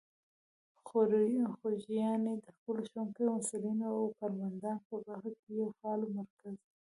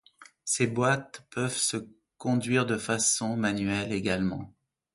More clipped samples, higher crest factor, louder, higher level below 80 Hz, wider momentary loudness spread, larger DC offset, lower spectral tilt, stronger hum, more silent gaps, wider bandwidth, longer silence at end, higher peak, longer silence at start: neither; about the same, 18 dB vs 18 dB; second, -36 LUFS vs -28 LUFS; second, -84 dBFS vs -58 dBFS; about the same, 13 LU vs 12 LU; neither; first, -7 dB/octave vs -4 dB/octave; neither; first, 2.58-2.66 s, 4.85-4.90 s, 5.39-5.47 s, 6.30-6.37 s vs none; about the same, 11.5 kHz vs 12 kHz; second, 0.25 s vs 0.45 s; second, -18 dBFS vs -12 dBFS; first, 0.85 s vs 0.2 s